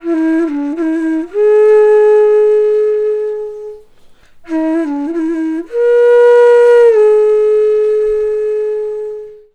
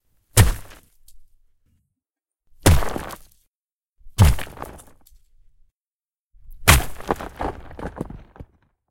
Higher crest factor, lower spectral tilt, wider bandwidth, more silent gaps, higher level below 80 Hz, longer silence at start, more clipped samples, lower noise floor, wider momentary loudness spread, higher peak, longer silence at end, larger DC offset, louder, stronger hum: second, 10 dB vs 24 dB; about the same, -5 dB/octave vs -4 dB/octave; second, 8.6 kHz vs 17 kHz; second, none vs 3.50-3.63 s, 3.73-3.81 s, 3.89-3.93 s, 5.77-5.99 s, 6.19-6.30 s; second, -48 dBFS vs -30 dBFS; second, 0.05 s vs 0.35 s; neither; second, -41 dBFS vs under -90 dBFS; second, 14 LU vs 21 LU; about the same, 0 dBFS vs 0 dBFS; second, 0.2 s vs 0.45 s; neither; first, -11 LUFS vs -20 LUFS; neither